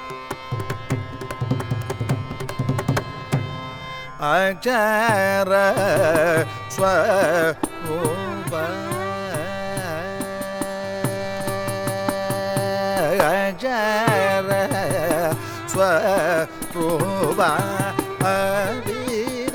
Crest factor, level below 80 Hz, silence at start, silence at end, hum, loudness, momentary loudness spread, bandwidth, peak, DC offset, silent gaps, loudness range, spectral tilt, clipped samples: 20 dB; -46 dBFS; 0 s; 0 s; none; -22 LUFS; 10 LU; over 20 kHz; -2 dBFS; under 0.1%; none; 7 LU; -5 dB/octave; under 0.1%